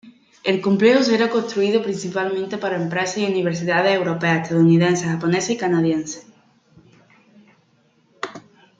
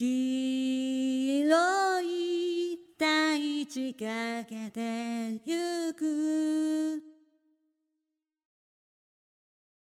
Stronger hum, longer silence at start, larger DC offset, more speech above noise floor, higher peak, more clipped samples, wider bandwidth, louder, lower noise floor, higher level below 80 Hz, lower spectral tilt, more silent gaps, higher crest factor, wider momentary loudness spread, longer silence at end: neither; about the same, 0.05 s vs 0 s; neither; second, 41 dB vs 54 dB; first, -2 dBFS vs -10 dBFS; neither; second, 8.8 kHz vs 15 kHz; first, -19 LUFS vs -30 LUFS; second, -60 dBFS vs -86 dBFS; first, -64 dBFS vs -88 dBFS; first, -5.5 dB/octave vs -3 dB/octave; neither; about the same, 18 dB vs 20 dB; about the same, 11 LU vs 10 LU; second, 0.4 s vs 2.85 s